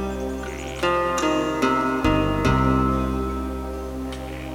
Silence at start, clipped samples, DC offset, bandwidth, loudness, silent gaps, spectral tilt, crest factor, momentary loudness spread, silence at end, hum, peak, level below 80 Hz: 0 s; under 0.1%; under 0.1%; 17 kHz; -23 LUFS; none; -6 dB/octave; 16 dB; 11 LU; 0 s; none; -6 dBFS; -32 dBFS